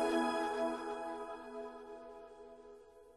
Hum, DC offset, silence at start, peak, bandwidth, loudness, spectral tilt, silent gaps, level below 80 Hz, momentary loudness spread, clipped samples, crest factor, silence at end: none; under 0.1%; 0 s; -22 dBFS; 13 kHz; -40 LUFS; -3.5 dB/octave; none; -72 dBFS; 21 LU; under 0.1%; 20 dB; 0 s